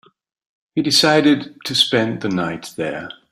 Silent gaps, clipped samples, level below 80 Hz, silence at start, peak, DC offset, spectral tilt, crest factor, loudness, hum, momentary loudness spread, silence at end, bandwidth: none; under 0.1%; -60 dBFS; 0.75 s; -2 dBFS; under 0.1%; -4 dB/octave; 18 dB; -17 LUFS; none; 13 LU; 0.2 s; 15.5 kHz